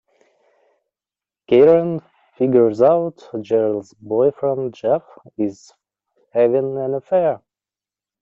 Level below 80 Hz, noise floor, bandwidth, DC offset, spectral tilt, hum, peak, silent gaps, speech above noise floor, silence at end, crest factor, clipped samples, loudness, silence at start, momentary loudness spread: -62 dBFS; under -90 dBFS; 7.4 kHz; under 0.1%; -8.5 dB/octave; none; -4 dBFS; none; over 73 dB; 0.85 s; 16 dB; under 0.1%; -18 LUFS; 1.5 s; 13 LU